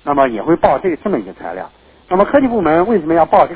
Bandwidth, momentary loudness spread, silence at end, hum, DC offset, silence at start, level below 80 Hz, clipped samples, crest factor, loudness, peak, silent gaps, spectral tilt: 4 kHz; 15 LU; 0 s; none; under 0.1%; 0.05 s; -42 dBFS; 0.2%; 14 dB; -14 LUFS; 0 dBFS; none; -10.5 dB/octave